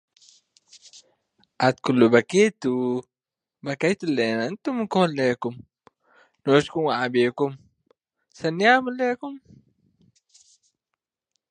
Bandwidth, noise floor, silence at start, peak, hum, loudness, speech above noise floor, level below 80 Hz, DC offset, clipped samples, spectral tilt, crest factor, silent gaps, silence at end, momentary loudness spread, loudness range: 10 kHz; -90 dBFS; 1.6 s; -2 dBFS; none; -23 LUFS; 68 dB; -68 dBFS; under 0.1%; under 0.1%; -5.5 dB/octave; 22 dB; none; 2.15 s; 14 LU; 4 LU